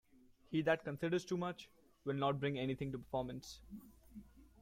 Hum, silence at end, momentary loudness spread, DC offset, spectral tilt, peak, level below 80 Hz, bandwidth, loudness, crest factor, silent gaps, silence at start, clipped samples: none; 0.2 s; 21 LU; under 0.1%; -6.5 dB/octave; -22 dBFS; -66 dBFS; 16 kHz; -40 LUFS; 20 dB; none; 0.5 s; under 0.1%